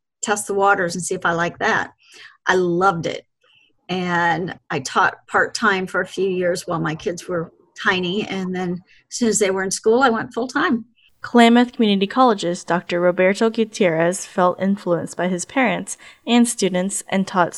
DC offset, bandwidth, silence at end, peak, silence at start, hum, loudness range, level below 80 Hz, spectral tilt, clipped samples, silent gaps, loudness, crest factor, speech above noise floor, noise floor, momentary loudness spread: under 0.1%; 13 kHz; 0 s; 0 dBFS; 0.2 s; none; 5 LU; -60 dBFS; -4 dB/octave; under 0.1%; none; -19 LUFS; 20 dB; 39 dB; -58 dBFS; 10 LU